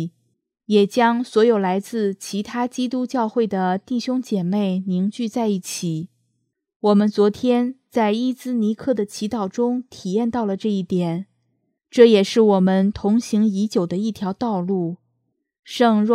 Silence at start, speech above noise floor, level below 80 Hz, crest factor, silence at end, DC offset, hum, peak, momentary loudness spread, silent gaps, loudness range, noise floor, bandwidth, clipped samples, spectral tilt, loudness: 0 s; 54 dB; -58 dBFS; 20 dB; 0 s; under 0.1%; none; 0 dBFS; 9 LU; 6.76-6.80 s, 15.59-15.63 s; 5 LU; -73 dBFS; 14.5 kHz; under 0.1%; -6.5 dB/octave; -20 LUFS